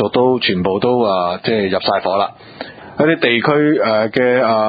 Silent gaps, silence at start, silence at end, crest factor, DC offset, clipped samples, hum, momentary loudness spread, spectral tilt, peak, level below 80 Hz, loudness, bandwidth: none; 0 s; 0 s; 16 dB; under 0.1%; under 0.1%; none; 9 LU; -9 dB/octave; 0 dBFS; -50 dBFS; -15 LUFS; 5 kHz